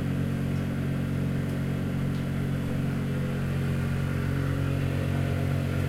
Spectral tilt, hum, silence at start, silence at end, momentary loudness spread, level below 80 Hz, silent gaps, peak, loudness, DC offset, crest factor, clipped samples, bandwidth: -7.5 dB/octave; none; 0 s; 0 s; 2 LU; -44 dBFS; none; -16 dBFS; -29 LUFS; under 0.1%; 12 dB; under 0.1%; 15 kHz